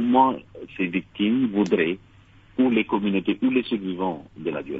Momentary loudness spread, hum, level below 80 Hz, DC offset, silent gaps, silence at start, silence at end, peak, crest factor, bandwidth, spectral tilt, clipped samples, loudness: 11 LU; none; -58 dBFS; under 0.1%; none; 0 s; 0 s; -6 dBFS; 18 dB; 7.4 kHz; -7.5 dB/octave; under 0.1%; -23 LUFS